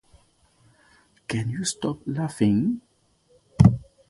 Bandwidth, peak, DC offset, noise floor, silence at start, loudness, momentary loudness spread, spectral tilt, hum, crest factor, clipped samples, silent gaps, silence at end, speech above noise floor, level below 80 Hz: 11.5 kHz; -2 dBFS; under 0.1%; -63 dBFS; 1.3 s; -24 LUFS; 15 LU; -6.5 dB/octave; none; 24 dB; under 0.1%; none; 0.25 s; 38 dB; -44 dBFS